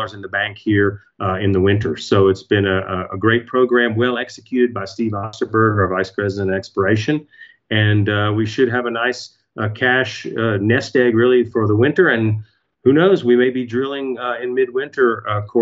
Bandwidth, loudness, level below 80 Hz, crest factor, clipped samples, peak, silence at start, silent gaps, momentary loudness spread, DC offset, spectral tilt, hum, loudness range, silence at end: 7.8 kHz; -17 LUFS; -56 dBFS; 16 dB; under 0.1%; -2 dBFS; 0 s; none; 9 LU; under 0.1%; -7 dB/octave; none; 3 LU; 0 s